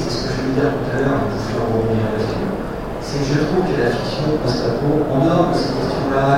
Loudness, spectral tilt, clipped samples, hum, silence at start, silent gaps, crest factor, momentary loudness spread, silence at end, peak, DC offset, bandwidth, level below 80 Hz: -19 LUFS; -6.5 dB/octave; under 0.1%; none; 0 s; none; 16 dB; 6 LU; 0 s; -2 dBFS; 0.5%; 16 kHz; -34 dBFS